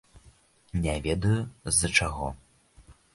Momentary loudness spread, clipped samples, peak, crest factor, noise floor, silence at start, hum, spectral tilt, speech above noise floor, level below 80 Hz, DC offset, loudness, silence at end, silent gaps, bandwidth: 13 LU; under 0.1%; -6 dBFS; 24 dB; -59 dBFS; 0.15 s; none; -3.5 dB/octave; 32 dB; -42 dBFS; under 0.1%; -27 LUFS; 0.2 s; none; 12 kHz